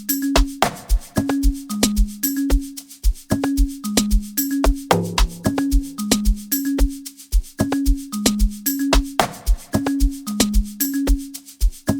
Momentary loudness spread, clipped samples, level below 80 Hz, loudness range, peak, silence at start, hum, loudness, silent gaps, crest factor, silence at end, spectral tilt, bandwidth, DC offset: 7 LU; under 0.1%; -22 dBFS; 1 LU; 0 dBFS; 0 s; none; -21 LUFS; none; 20 dB; 0 s; -4.5 dB/octave; 19 kHz; under 0.1%